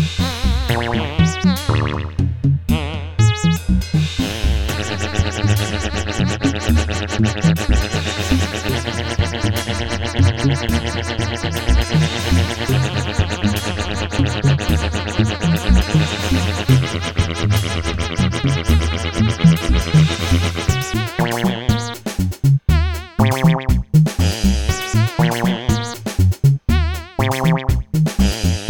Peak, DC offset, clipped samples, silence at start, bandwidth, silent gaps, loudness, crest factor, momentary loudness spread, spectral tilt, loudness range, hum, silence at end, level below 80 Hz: 0 dBFS; under 0.1%; under 0.1%; 0 s; 18.5 kHz; none; -18 LUFS; 16 dB; 6 LU; -5.5 dB/octave; 2 LU; none; 0 s; -24 dBFS